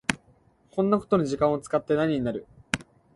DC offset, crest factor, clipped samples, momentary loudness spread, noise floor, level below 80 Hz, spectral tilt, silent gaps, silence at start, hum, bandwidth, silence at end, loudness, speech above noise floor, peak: under 0.1%; 26 dB; under 0.1%; 10 LU; -61 dBFS; -54 dBFS; -5.5 dB/octave; none; 0.1 s; none; 11.5 kHz; 0.35 s; -26 LUFS; 36 dB; -2 dBFS